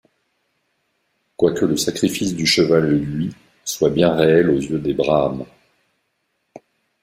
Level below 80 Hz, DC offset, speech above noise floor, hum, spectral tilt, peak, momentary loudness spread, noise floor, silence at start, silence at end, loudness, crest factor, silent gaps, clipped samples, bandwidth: -50 dBFS; under 0.1%; 54 dB; none; -5 dB/octave; -2 dBFS; 13 LU; -71 dBFS; 1.4 s; 0.45 s; -18 LUFS; 18 dB; none; under 0.1%; 16 kHz